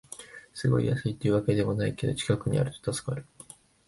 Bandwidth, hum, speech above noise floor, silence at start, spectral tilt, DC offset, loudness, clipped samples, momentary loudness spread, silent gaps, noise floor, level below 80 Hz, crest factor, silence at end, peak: 11.5 kHz; none; 25 dB; 0.1 s; -6.5 dB/octave; under 0.1%; -28 LUFS; under 0.1%; 18 LU; none; -52 dBFS; -52 dBFS; 18 dB; 0.65 s; -10 dBFS